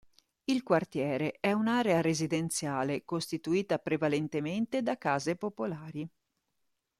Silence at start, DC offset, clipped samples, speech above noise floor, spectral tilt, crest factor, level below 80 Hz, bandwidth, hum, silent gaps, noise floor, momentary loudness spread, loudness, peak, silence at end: 0.5 s; under 0.1%; under 0.1%; 50 dB; -5 dB/octave; 20 dB; -70 dBFS; 14.5 kHz; none; none; -81 dBFS; 9 LU; -31 LUFS; -12 dBFS; 0.9 s